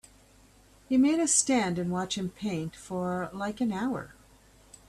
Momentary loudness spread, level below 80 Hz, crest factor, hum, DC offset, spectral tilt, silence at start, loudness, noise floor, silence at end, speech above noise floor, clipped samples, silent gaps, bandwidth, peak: 12 LU; -60 dBFS; 20 dB; none; under 0.1%; -4 dB/octave; 0.9 s; -28 LUFS; -58 dBFS; 0.75 s; 30 dB; under 0.1%; none; 13.5 kHz; -10 dBFS